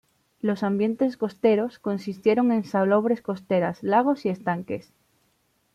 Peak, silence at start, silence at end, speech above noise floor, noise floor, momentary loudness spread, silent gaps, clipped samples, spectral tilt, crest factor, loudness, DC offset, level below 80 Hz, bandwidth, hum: -8 dBFS; 0.45 s; 0.95 s; 45 dB; -68 dBFS; 8 LU; none; under 0.1%; -8 dB/octave; 16 dB; -24 LUFS; under 0.1%; -68 dBFS; 11 kHz; none